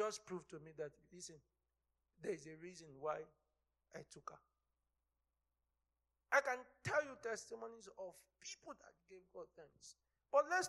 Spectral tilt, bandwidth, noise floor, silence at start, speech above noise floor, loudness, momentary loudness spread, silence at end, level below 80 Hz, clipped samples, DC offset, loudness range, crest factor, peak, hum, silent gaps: -3 dB/octave; 12.5 kHz; -90 dBFS; 0 s; 45 dB; -45 LUFS; 22 LU; 0 s; -84 dBFS; under 0.1%; under 0.1%; 10 LU; 24 dB; -22 dBFS; none; none